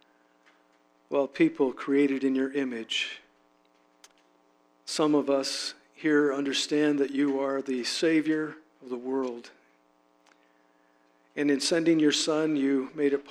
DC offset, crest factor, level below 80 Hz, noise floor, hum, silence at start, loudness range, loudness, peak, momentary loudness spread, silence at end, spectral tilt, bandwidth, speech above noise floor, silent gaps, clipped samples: under 0.1%; 16 dB; -80 dBFS; -65 dBFS; none; 1.1 s; 5 LU; -27 LUFS; -12 dBFS; 11 LU; 0 s; -3.5 dB/octave; 13 kHz; 39 dB; none; under 0.1%